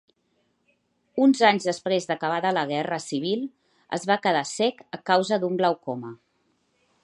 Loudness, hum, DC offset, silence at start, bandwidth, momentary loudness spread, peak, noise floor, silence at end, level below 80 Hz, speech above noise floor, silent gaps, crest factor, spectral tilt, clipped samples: -24 LUFS; none; under 0.1%; 1.15 s; 11 kHz; 14 LU; -4 dBFS; -71 dBFS; 0.9 s; -76 dBFS; 47 dB; none; 22 dB; -4.5 dB/octave; under 0.1%